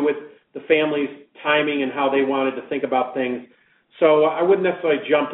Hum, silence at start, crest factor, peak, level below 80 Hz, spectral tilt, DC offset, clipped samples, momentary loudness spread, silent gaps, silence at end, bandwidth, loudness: none; 0 s; 18 dB; -2 dBFS; -70 dBFS; -2.5 dB/octave; under 0.1%; under 0.1%; 11 LU; none; 0 s; 4 kHz; -20 LUFS